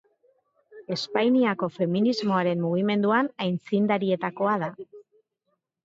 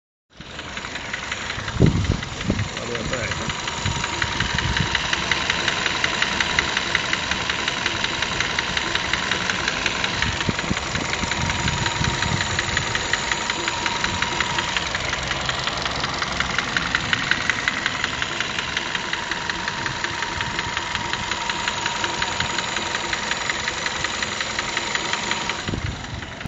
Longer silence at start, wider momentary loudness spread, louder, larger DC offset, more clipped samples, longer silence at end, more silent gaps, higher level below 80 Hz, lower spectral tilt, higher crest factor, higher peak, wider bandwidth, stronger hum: first, 0.75 s vs 0.35 s; first, 9 LU vs 5 LU; second, -25 LUFS vs -22 LUFS; neither; neither; first, 0.85 s vs 0 s; neither; second, -74 dBFS vs -38 dBFS; first, -7 dB/octave vs -2.5 dB/octave; second, 18 dB vs 24 dB; second, -8 dBFS vs 0 dBFS; about the same, 7.8 kHz vs 8.2 kHz; neither